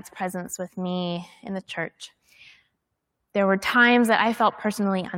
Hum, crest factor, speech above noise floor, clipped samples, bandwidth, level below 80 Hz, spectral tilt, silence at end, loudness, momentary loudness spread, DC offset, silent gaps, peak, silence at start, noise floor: none; 20 dB; 55 dB; under 0.1%; 16.5 kHz; -68 dBFS; -4.5 dB/octave; 0 s; -23 LUFS; 17 LU; under 0.1%; none; -4 dBFS; 0.05 s; -79 dBFS